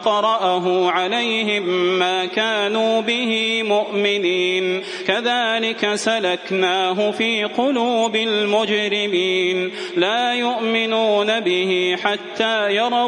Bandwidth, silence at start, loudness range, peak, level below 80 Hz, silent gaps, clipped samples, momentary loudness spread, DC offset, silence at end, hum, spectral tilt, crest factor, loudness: 10.5 kHz; 0 s; 1 LU; -2 dBFS; -72 dBFS; none; under 0.1%; 3 LU; under 0.1%; 0 s; none; -3.5 dB/octave; 18 dB; -18 LUFS